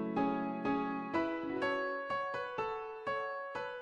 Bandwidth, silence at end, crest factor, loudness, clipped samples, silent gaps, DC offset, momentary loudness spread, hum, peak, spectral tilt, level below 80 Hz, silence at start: 9 kHz; 0 s; 16 dB; -37 LUFS; under 0.1%; none; under 0.1%; 5 LU; none; -22 dBFS; -6.5 dB/octave; -68 dBFS; 0 s